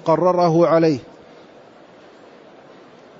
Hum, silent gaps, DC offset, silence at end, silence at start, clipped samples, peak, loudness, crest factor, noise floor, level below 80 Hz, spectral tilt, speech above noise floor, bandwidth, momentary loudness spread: none; none; under 0.1%; 2.2 s; 0.05 s; under 0.1%; -4 dBFS; -16 LUFS; 16 dB; -45 dBFS; -64 dBFS; -7.5 dB/octave; 30 dB; 7.2 kHz; 6 LU